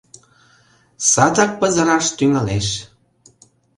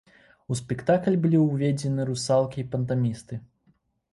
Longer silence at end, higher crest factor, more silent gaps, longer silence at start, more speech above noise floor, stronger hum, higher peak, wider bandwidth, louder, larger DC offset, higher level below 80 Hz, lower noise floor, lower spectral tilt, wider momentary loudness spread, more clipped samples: first, 0.9 s vs 0.7 s; about the same, 18 dB vs 18 dB; neither; first, 1 s vs 0.5 s; second, 38 dB vs 42 dB; neither; first, 0 dBFS vs -8 dBFS; about the same, 11.5 kHz vs 11.5 kHz; first, -16 LUFS vs -25 LUFS; neither; first, -46 dBFS vs -58 dBFS; second, -55 dBFS vs -66 dBFS; second, -3.5 dB/octave vs -7 dB/octave; second, 8 LU vs 11 LU; neither